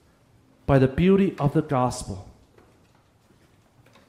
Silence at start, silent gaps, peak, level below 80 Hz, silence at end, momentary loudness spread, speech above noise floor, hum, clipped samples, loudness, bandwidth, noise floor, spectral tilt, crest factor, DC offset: 0.7 s; none; -8 dBFS; -46 dBFS; 1.85 s; 17 LU; 38 dB; none; under 0.1%; -22 LUFS; 12.5 kHz; -59 dBFS; -7.5 dB/octave; 18 dB; under 0.1%